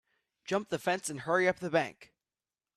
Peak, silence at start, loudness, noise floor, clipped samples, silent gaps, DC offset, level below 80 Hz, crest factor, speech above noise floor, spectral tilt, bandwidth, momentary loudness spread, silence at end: -14 dBFS; 0.5 s; -32 LUFS; under -90 dBFS; under 0.1%; none; under 0.1%; -74 dBFS; 20 dB; over 58 dB; -4.5 dB/octave; 14.5 kHz; 8 LU; 0.7 s